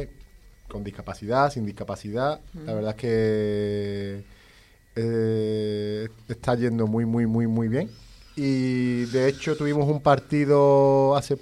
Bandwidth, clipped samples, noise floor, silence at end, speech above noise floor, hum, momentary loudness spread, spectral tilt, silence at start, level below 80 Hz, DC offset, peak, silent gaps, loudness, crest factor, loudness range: 12.5 kHz; under 0.1%; -54 dBFS; 0.05 s; 31 dB; none; 16 LU; -7.5 dB/octave; 0 s; -50 dBFS; under 0.1%; -6 dBFS; none; -24 LUFS; 18 dB; 6 LU